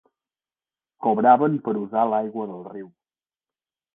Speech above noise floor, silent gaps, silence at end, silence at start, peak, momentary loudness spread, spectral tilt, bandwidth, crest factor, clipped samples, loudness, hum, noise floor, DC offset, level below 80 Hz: over 69 dB; none; 1.1 s; 1 s; -4 dBFS; 20 LU; -11 dB/octave; 3.8 kHz; 22 dB; under 0.1%; -21 LUFS; none; under -90 dBFS; under 0.1%; -74 dBFS